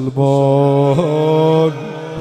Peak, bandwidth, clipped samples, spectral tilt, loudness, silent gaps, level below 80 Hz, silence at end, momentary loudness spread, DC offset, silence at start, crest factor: 0 dBFS; 9.2 kHz; under 0.1%; -8.5 dB/octave; -13 LUFS; none; -54 dBFS; 0 s; 7 LU; under 0.1%; 0 s; 14 dB